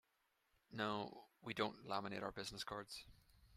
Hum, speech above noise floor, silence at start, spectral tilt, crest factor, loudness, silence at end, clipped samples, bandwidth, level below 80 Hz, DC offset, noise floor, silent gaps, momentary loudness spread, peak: none; 37 dB; 0.7 s; -4 dB/octave; 24 dB; -47 LUFS; 0 s; under 0.1%; 15.5 kHz; -74 dBFS; under 0.1%; -84 dBFS; none; 12 LU; -24 dBFS